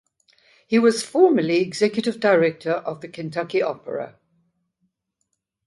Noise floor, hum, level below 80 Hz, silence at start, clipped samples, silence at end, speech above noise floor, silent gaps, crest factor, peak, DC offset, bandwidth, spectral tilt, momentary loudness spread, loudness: -76 dBFS; none; -70 dBFS; 0.7 s; under 0.1%; 1.6 s; 56 dB; none; 20 dB; -4 dBFS; under 0.1%; 11.5 kHz; -5 dB/octave; 14 LU; -21 LUFS